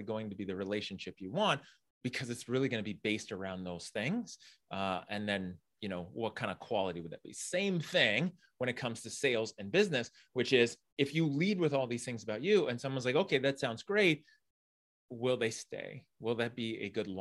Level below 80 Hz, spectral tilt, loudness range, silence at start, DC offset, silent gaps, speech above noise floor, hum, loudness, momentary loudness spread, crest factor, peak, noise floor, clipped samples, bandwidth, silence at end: -76 dBFS; -4.5 dB/octave; 6 LU; 0 s; under 0.1%; 1.90-2.01 s, 10.92-10.97 s, 14.50-15.09 s; over 55 dB; none; -35 LUFS; 13 LU; 22 dB; -12 dBFS; under -90 dBFS; under 0.1%; 12.5 kHz; 0 s